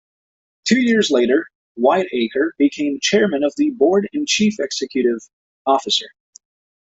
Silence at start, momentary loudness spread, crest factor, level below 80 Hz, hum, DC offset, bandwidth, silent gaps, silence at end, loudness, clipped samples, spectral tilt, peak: 0.65 s; 7 LU; 16 dB; -62 dBFS; none; under 0.1%; 8.2 kHz; 1.55-1.75 s, 5.33-5.65 s; 0.75 s; -18 LUFS; under 0.1%; -3.5 dB/octave; -2 dBFS